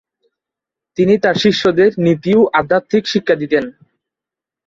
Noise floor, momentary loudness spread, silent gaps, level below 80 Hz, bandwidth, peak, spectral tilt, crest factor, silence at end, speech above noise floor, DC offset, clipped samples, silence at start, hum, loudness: -86 dBFS; 6 LU; none; -54 dBFS; 7.6 kHz; -2 dBFS; -6 dB/octave; 14 dB; 0.95 s; 73 dB; under 0.1%; under 0.1%; 1 s; none; -14 LUFS